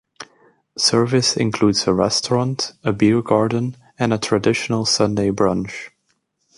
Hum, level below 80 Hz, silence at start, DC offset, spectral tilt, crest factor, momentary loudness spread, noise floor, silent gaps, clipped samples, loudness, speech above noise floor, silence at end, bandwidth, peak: none; -50 dBFS; 0.2 s; under 0.1%; -4.5 dB/octave; 16 dB; 8 LU; -68 dBFS; none; under 0.1%; -18 LUFS; 50 dB; 0.7 s; 11.5 kHz; -2 dBFS